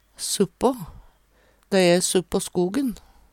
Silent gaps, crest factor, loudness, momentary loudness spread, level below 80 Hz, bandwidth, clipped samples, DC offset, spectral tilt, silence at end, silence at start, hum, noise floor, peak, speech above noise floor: none; 18 dB; -22 LUFS; 15 LU; -50 dBFS; 17 kHz; under 0.1%; under 0.1%; -4 dB/octave; 0.35 s; 0.2 s; none; -60 dBFS; -6 dBFS; 38 dB